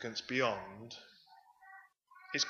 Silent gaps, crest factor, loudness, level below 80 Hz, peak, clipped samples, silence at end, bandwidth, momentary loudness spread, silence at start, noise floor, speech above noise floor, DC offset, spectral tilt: none; 22 dB; -37 LUFS; -78 dBFS; -18 dBFS; under 0.1%; 0 s; 14.5 kHz; 25 LU; 0 s; -63 dBFS; 25 dB; under 0.1%; -2.5 dB/octave